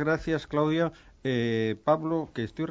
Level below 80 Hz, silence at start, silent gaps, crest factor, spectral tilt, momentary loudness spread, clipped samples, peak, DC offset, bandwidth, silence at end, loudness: -54 dBFS; 0 s; none; 18 dB; -7.5 dB/octave; 7 LU; under 0.1%; -10 dBFS; under 0.1%; 7.8 kHz; 0 s; -28 LUFS